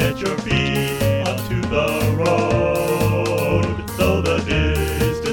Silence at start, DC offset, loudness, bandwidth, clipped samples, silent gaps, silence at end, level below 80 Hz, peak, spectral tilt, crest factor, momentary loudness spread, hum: 0 s; under 0.1%; -19 LUFS; 18 kHz; under 0.1%; none; 0 s; -32 dBFS; -4 dBFS; -5.5 dB/octave; 16 dB; 3 LU; none